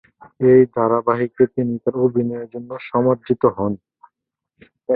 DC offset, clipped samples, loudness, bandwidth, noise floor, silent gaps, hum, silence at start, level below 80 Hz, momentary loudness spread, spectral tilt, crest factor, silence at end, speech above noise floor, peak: under 0.1%; under 0.1%; -18 LUFS; 4.2 kHz; -79 dBFS; none; none; 0.4 s; -56 dBFS; 17 LU; -13 dB/octave; 18 dB; 0 s; 62 dB; -2 dBFS